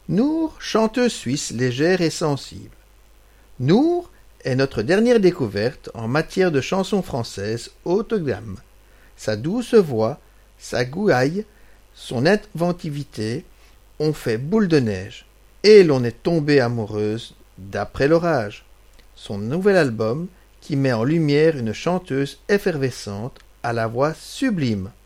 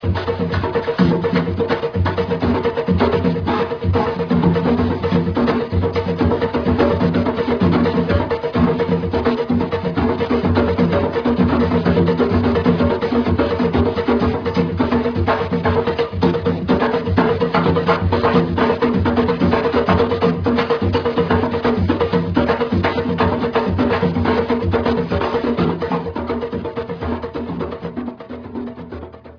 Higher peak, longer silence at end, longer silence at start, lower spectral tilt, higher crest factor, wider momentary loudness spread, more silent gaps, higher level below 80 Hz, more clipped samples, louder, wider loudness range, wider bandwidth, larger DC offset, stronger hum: about the same, 0 dBFS vs 0 dBFS; about the same, 0.15 s vs 0.05 s; about the same, 0.1 s vs 0 s; second, -6 dB/octave vs -9 dB/octave; about the same, 20 dB vs 16 dB; first, 13 LU vs 7 LU; neither; second, -48 dBFS vs -34 dBFS; neither; about the same, -20 LUFS vs -18 LUFS; about the same, 5 LU vs 3 LU; first, 15.5 kHz vs 5.4 kHz; neither; neither